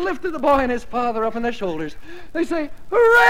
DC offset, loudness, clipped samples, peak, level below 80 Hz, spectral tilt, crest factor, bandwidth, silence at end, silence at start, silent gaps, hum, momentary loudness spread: 3%; -21 LUFS; under 0.1%; -2 dBFS; -42 dBFS; -5 dB/octave; 16 dB; 16.5 kHz; 0 s; 0 s; none; none; 13 LU